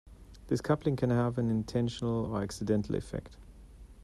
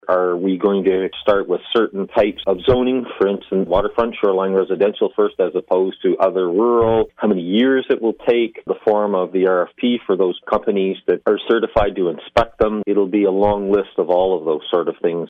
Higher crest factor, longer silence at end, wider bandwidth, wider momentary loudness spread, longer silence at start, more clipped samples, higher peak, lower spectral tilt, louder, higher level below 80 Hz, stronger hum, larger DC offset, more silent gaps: first, 18 dB vs 12 dB; about the same, 0 s vs 0 s; first, 12.5 kHz vs 5.4 kHz; about the same, 6 LU vs 4 LU; about the same, 0.05 s vs 0.05 s; neither; second, -14 dBFS vs -4 dBFS; about the same, -7.5 dB/octave vs -8 dB/octave; second, -32 LUFS vs -18 LUFS; second, -52 dBFS vs -42 dBFS; neither; neither; neither